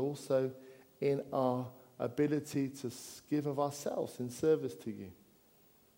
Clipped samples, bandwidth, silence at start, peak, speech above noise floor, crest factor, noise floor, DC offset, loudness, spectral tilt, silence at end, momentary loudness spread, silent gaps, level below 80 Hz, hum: under 0.1%; 16.5 kHz; 0 s; -20 dBFS; 31 dB; 18 dB; -66 dBFS; under 0.1%; -36 LUFS; -6.5 dB/octave; 0.85 s; 13 LU; none; -76 dBFS; none